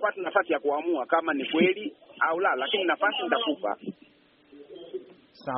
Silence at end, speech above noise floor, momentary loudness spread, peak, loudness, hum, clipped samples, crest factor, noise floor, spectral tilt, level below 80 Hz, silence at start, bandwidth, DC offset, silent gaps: 0 s; 33 dB; 16 LU; -8 dBFS; -26 LUFS; none; under 0.1%; 20 dB; -60 dBFS; -1.5 dB/octave; -76 dBFS; 0 s; 4.6 kHz; under 0.1%; none